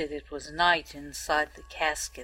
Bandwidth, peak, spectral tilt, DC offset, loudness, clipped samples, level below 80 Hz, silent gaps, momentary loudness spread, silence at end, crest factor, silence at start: 16 kHz; -8 dBFS; -2 dB/octave; under 0.1%; -28 LUFS; under 0.1%; -50 dBFS; none; 14 LU; 0 s; 22 dB; 0 s